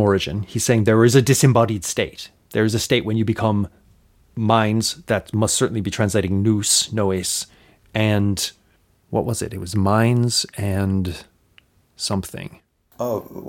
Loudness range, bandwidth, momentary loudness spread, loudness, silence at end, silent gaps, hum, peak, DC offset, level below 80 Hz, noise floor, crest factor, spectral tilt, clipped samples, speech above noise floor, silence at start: 4 LU; 17 kHz; 13 LU; -20 LUFS; 0 s; none; none; -2 dBFS; under 0.1%; -48 dBFS; -59 dBFS; 20 dB; -4.5 dB/octave; under 0.1%; 40 dB; 0 s